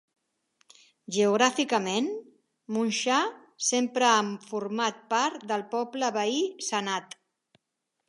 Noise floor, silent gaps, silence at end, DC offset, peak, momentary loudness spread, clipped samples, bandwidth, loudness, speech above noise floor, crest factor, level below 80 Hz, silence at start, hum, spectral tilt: -82 dBFS; none; 1.05 s; under 0.1%; -6 dBFS; 11 LU; under 0.1%; 11.5 kHz; -27 LUFS; 55 dB; 22 dB; -84 dBFS; 1.1 s; none; -2.5 dB/octave